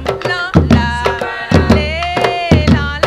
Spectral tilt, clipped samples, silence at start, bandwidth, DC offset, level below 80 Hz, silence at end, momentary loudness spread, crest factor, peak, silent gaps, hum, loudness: -6.5 dB/octave; 0.5%; 0 s; 12 kHz; under 0.1%; -22 dBFS; 0 s; 6 LU; 12 dB; 0 dBFS; none; none; -13 LUFS